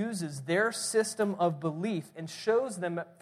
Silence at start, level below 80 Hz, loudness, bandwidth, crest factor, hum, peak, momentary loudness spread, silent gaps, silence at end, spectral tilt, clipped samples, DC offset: 0 s; -78 dBFS; -31 LUFS; 15 kHz; 16 dB; none; -16 dBFS; 8 LU; none; 0.1 s; -4.5 dB/octave; under 0.1%; under 0.1%